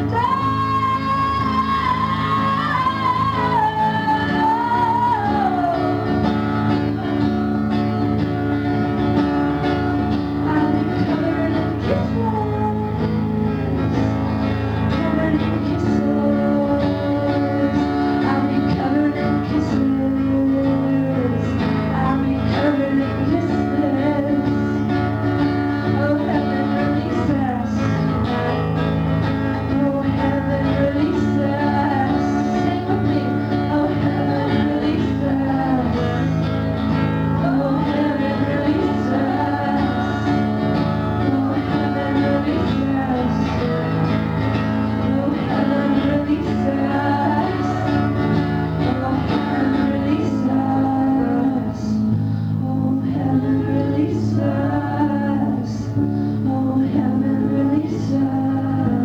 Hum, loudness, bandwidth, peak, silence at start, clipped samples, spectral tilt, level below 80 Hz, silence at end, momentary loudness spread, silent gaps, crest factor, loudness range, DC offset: none; -19 LUFS; 7.8 kHz; -6 dBFS; 0 s; under 0.1%; -8.5 dB/octave; -38 dBFS; 0 s; 2 LU; none; 14 dB; 1 LU; under 0.1%